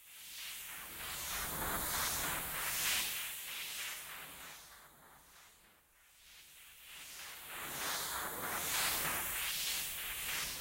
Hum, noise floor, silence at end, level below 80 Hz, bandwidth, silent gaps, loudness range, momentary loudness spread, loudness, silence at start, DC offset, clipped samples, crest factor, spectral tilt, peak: none; -66 dBFS; 0 s; -60 dBFS; 16 kHz; none; 14 LU; 20 LU; -38 LUFS; 0 s; under 0.1%; under 0.1%; 18 dB; 0 dB/octave; -22 dBFS